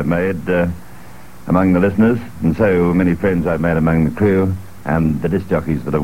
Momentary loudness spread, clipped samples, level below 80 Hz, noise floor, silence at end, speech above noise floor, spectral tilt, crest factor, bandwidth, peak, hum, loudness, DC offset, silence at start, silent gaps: 7 LU; under 0.1%; -36 dBFS; -39 dBFS; 0 s; 24 dB; -9 dB/octave; 14 dB; 16 kHz; -2 dBFS; none; -16 LUFS; 2%; 0 s; none